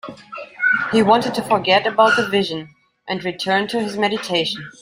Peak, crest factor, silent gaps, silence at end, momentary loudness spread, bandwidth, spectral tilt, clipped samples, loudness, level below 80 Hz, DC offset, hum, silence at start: -2 dBFS; 18 dB; none; 0.1 s; 12 LU; 16 kHz; -4.5 dB/octave; under 0.1%; -18 LUFS; -60 dBFS; under 0.1%; none; 0.05 s